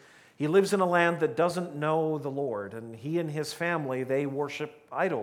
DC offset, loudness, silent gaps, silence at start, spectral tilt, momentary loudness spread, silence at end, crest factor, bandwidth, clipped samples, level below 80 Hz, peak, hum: under 0.1%; -29 LUFS; none; 0.4 s; -6 dB/octave; 11 LU; 0 s; 20 dB; 16.5 kHz; under 0.1%; -78 dBFS; -8 dBFS; none